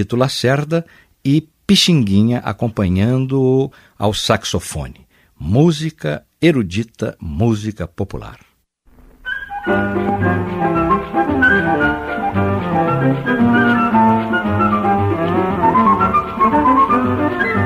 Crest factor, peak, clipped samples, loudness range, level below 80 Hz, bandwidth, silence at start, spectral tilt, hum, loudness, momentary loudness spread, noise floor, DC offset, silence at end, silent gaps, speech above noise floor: 16 dB; 0 dBFS; under 0.1%; 7 LU; -40 dBFS; 15.5 kHz; 0 s; -6 dB/octave; none; -16 LUFS; 12 LU; -53 dBFS; under 0.1%; 0 s; none; 37 dB